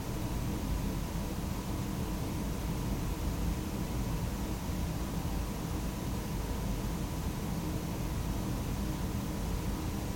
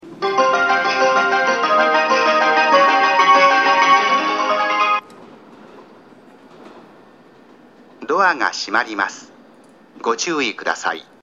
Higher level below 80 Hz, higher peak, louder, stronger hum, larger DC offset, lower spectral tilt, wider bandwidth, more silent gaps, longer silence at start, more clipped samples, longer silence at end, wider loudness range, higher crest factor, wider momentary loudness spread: first, -38 dBFS vs -70 dBFS; second, -22 dBFS vs -2 dBFS; second, -36 LUFS vs -15 LUFS; neither; neither; first, -6 dB/octave vs -2 dB/octave; first, 17 kHz vs 8 kHz; neither; about the same, 0 s vs 0.05 s; neither; second, 0 s vs 0.2 s; second, 0 LU vs 10 LU; about the same, 12 dB vs 16 dB; second, 1 LU vs 10 LU